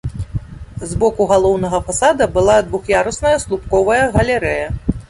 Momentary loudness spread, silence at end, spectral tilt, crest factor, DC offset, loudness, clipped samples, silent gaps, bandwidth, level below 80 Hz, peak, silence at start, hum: 12 LU; 0.05 s; -5 dB/octave; 14 dB; under 0.1%; -15 LUFS; under 0.1%; none; 11.5 kHz; -30 dBFS; -2 dBFS; 0.05 s; none